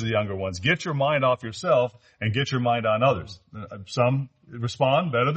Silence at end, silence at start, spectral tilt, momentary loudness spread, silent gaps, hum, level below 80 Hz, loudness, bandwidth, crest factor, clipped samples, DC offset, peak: 0 s; 0 s; -6 dB/octave; 12 LU; none; none; -58 dBFS; -24 LUFS; 8.4 kHz; 16 dB; under 0.1%; under 0.1%; -8 dBFS